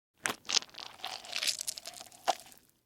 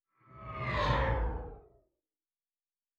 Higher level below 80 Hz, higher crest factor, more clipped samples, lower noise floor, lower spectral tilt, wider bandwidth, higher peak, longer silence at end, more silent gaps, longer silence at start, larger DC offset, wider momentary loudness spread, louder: second, -78 dBFS vs -42 dBFS; first, 32 dB vs 20 dB; neither; second, -56 dBFS vs under -90 dBFS; second, 1 dB/octave vs -6.5 dB/octave; first, 19.5 kHz vs 7.4 kHz; first, -6 dBFS vs -18 dBFS; second, 0.3 s vs 1.4 s; neither; about the same, 0.25 s vs 0.3 s; neither; second, 13 LU vs 18 LU; about the same, -34 LUFS vs -33 LUFS